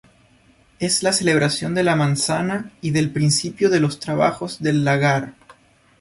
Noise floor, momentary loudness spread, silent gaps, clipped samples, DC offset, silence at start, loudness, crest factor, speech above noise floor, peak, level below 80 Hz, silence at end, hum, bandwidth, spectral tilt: -55 dBFS; 7 LU; none; under 0.1%; under 0.1%; 0.8 s; -19 LUFS; 16 dB; 36 dB; -4 dBFS; -54 dBFS; 0.5 s; none; 11.5 kHz; -4.5 dB/octave